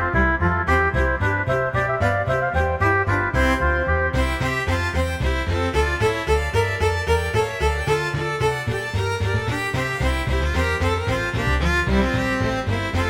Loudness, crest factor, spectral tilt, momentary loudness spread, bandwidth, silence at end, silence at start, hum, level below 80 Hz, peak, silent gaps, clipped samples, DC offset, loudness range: -21 LUFS; 16 dB; -6 dB/octave; 4 LU; 16.5 kHz; 0 s; 0 s; none; -28 dBFS; -6 dBFS; none; under 0.1%; under 0.1%; 2 LU